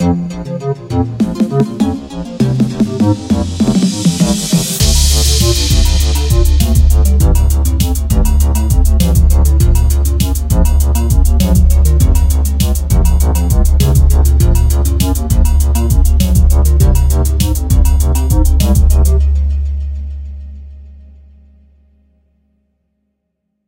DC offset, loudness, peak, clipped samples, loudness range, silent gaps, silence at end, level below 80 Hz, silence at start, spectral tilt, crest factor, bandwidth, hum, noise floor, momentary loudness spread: under 0.1%; -12 LUFS; 0 dBFS; under 0.1%; 4 LU; none; 2.75 s; -12 dBFS; 0 s; -5.5 dB/octave; 10 dB; 17 kHz; none; -69 dBFS; 7 LU